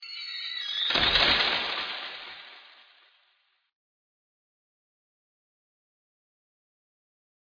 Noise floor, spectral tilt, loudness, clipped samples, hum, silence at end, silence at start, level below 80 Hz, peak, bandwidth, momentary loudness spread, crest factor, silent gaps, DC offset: -71 dBFS; -2.5 dB/octave; -25 LUFS; under 0.1%; none; 4.9 s; 0 s; -54 dBFS; -8 dBFS; 5.4 kHz; 21 LU; 24 dB; none; under 0.1%